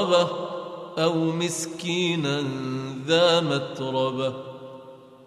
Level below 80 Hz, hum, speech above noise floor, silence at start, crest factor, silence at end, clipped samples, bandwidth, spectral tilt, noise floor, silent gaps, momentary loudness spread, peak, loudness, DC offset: -70 dBFS; none; 22 dB; 0 s; 18 dB; 0 s; under 0.1%; 13.5 kHz; -4.5 dB/octave; -46 dBFS; none; 16 LU; -8 dBFS; -25 LUFS; under 0.1%